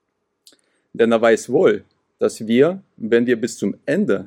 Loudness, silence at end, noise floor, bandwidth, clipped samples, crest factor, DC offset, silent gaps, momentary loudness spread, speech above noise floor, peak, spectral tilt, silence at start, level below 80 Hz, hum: -18 LUFS; 0 s; -56 dBFS; 15 kHz; under 0.1%; 16 dB; under 0.1%; none; 9 LU; 39 dB; -2 dBFS; -5.5 dB/octave; 0.95 s; -70 dBFS; none